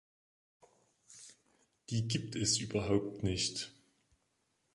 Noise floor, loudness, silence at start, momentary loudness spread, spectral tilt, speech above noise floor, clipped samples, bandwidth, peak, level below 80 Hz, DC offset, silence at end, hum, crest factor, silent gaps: -79 dBFS; -35 LUFS; 1.1 s; 22 LU; -4 dB/octave; 44 dB; under 0.1%; 11.5 kHz; -18 dBFS; -58 dBFS; under 0.1%; 1.05 s; none; 22 dB; none